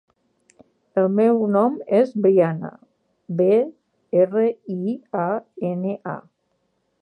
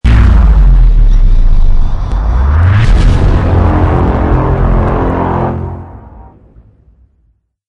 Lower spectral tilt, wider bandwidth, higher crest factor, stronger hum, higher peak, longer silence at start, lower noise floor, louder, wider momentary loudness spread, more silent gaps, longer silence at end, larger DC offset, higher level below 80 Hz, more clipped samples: first, -10 dB/octave vs -8.5 dB/octave; first, 9.6 kHz vs 6.2 kHz; first, 16 dB vs 8 dB; neither; second, -6 dBFS vs 0 dBFS; first, 0.95 s vs 0.05 s; first, -70 dBFS vs -54 dBFS; second, -21 LUFS vs -11 LUFS; first, 12 LU vs 8 LU; neither; second, 0.8 s vs 1.45 s; neither; second, -76 dBFS vs -8 dBFS; neither